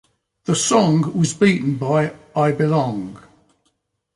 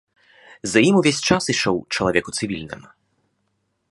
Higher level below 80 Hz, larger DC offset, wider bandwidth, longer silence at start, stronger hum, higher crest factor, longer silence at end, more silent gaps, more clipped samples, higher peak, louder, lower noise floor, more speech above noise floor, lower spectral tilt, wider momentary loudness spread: second, -58 dBFS vs -50 dBFS; neither; about the same, 11.5 kHz vs 11.5 kHz; about the same, 0.5 s vs 0.5 s; neither; about the same, 16 dB vs 20 dB; second, 1 s vs 1.15 s; neither; neither; about the same, -4 dBFS vs -2 dBFS; about the same, -18 LUFS vs -19 LUFS; about the same, -69 dBFS vs -71 dBFS; about the same, 51 dB vs 51 dB; first, -5.5 dB/octave vs -4 dB/octave; second, 10 LU vs 15 LU